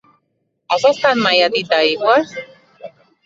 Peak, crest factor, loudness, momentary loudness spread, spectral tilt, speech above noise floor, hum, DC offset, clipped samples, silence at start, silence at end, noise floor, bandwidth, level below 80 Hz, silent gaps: 0 dBFS; 16 dB; -14 LUFS; 9 LU; -3.5 dB/octave; 54 dB; none; under 0.1%; under 0.1%; 0.7 s; 0.35 s; -69 dBFS; 7.8 kHz; -64 dBFS; none